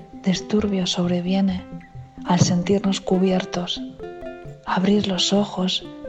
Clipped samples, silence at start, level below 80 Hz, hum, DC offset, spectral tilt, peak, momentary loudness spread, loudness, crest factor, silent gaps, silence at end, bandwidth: under 0.1%; 0 s; -48 dBFS; none; under 0.1%; -5.5 dB/octave; -2 dBFS; 16 LU; -21 LUFS; 20 dB; none; 0 s; 8.4 kHz